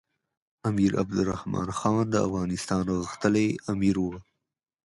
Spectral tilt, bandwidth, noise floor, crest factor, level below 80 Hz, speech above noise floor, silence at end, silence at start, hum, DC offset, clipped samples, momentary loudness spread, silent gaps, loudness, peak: -6.5 dB/octave; 11.5 kHz; -85 dBFS; 20 dB; -50 dBFS; 58 dB; 0.65 s; 0.65 s; none; under 0.1%; under 0.1%; 6 LU; none; -27 LUFS; -8 dBFS